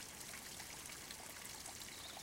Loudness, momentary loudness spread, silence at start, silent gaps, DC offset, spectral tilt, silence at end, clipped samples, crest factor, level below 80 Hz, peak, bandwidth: -49 LUFS; 1 LU; 0 s; none; under 0.1%; -1 dB/octave; 0 s; under 0.1%; 18 dB; -70 dBFS; -32 dBFS; 17 kHz